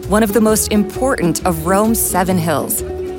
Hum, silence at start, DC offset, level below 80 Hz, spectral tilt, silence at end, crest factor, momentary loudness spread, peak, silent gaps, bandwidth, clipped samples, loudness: none; 0 s; under 0.1%; -32 dBFS; -4.5 dB/octave; 0 s; 12 dB; 5 LU; -2 dBFS; none; 17 kHz; under 0.1%; -15 LUFS